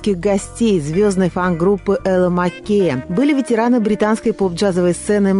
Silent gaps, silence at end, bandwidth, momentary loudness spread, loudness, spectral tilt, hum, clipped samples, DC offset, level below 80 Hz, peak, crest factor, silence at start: none; 0 s; 11.5 kHz; 2 LU; -16 LUFS; -6.5 dB/octave; none; under 0.1%; under 0.1%; -40 dBFS; -6 dBFS; 10 dB; 0 s